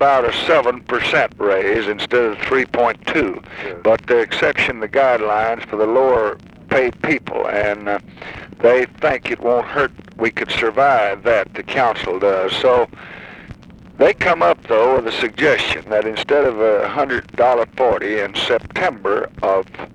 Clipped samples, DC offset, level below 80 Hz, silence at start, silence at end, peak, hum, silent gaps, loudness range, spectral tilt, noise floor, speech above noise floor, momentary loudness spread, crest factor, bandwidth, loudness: under 0.1%; under 0.1%; -46 dBFS; 0 s; 0.05 s; -2 dBFS; none; none; 2 LU; -5 dB/octave; -38 dBFS; 21 dB; 6 LU; 14 dB; 10.5 kHz; -17 LUFS